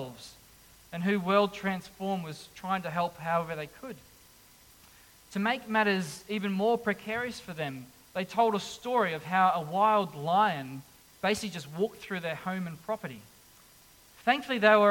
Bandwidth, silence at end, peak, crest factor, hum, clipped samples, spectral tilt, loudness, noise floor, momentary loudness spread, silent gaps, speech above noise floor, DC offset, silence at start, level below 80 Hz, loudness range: 17.5 kHz; 0 s; -8 dBFS; 24 dB; none; under 0.1%; -5 dB/octave; -30 LUFS; -58 dBFS; 16 LU; none; 28 dB; under 0.1%; 0 s; -66 dBFS; 7 LU